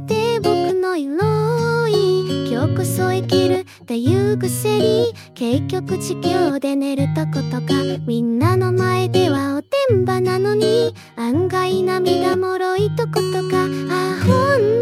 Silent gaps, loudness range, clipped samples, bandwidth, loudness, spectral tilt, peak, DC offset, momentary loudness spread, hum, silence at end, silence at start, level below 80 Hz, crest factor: none; 2 LU; under 0.1%; 16 kHz; -18 LUFS; -6 dB/octave; -2 dBFS; under 0.1%; 5 LU; none; 0 s; 0 s; -58 dBFS; 16 dB